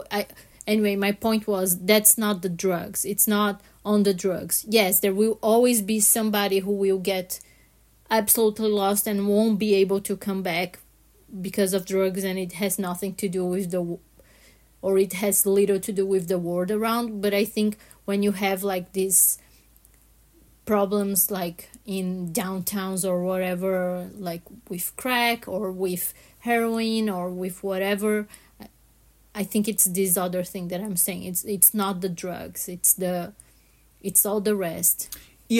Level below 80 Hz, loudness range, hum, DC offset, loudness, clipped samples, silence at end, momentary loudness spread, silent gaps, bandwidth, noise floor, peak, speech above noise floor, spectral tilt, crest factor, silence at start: -60 dBFS; 6 LU; none; under 0.1%; -23 LUFS; under 0.1%; 0 s; 13 LU; none; 16.5 kHz; -58 dBFS; -2 dBFS; 34 dB; -3.5 dB/octave; 22 dB; 0 s